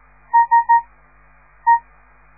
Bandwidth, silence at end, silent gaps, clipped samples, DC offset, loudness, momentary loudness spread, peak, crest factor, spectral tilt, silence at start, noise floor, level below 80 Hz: 2.6 kHz; 0.6 s; none; under 0.1%; 0.2%; -16 LUFS; 5 LU; -4 dBFS; 14 dB; -7 dB/octave; 0.35 s; -51 dBFS; -54 dBFS